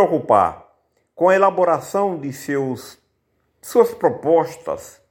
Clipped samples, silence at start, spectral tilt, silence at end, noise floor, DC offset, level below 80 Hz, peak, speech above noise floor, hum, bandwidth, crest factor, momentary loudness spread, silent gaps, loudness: under 0.1%; 0 s; -6 dB/octave; 0.2 s; -68 dBFS; under 0.1%; -60 dBFS; 0 dBFS; 49 dB; none; 17 kHz; 18 dB; 14 LU; none; -19 LUFS